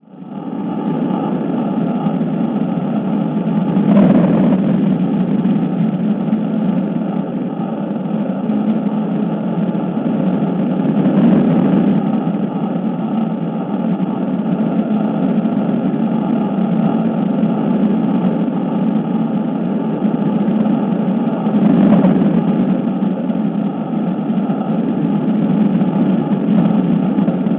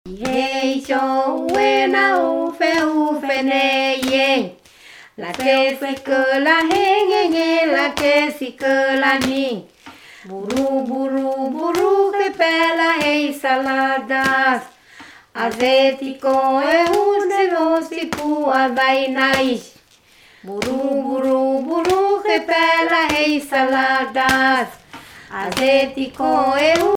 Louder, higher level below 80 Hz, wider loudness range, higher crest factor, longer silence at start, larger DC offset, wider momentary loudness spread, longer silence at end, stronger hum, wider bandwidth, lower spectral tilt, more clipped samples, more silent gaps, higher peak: about the same, -16 LUFS vs -17 LUFS; about the same, -52 dBFS vs -54 dBFS; about the same, 4 LU vs 3 LU; about the same, 14 dB vs 18 dB; about the same, 0.15 s vs 0.05 s; neither; about the same, 7 LU vs 8 LU; about the same, 0 s vs 0 s; neither; second, 3.9 kHz vs 18.5 kHz; first, -12.5 dB/octave vs -3.5 dB/octave; neither; neither; about the same, 0 dBFS vs 0 dBFS